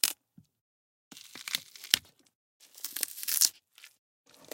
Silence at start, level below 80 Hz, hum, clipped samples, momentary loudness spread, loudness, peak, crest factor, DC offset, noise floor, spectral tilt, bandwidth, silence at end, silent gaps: 0.05 s; -78 dBFS; none; under 0.1%; 20 LU; -30 LUFS; -2 dBFS; 34 dB; under 0.1%; -56 dBFS; 2.5 dB/octave; 17 kHz; 0.65 s; 0.61-1.11 s, 2.35-2.60 s